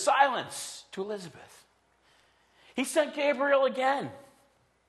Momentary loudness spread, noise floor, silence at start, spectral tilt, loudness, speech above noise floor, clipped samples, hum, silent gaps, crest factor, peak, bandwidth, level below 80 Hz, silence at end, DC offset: 14 LU; -67 dBFS; 0 s; -3 dB/octave; -29 LUFS; 39 dB; under 0.1%; none; none; 22 dB; -8 dBFS; 12.5 kHz; -78 dBFS; 0.65 s; under 0.1%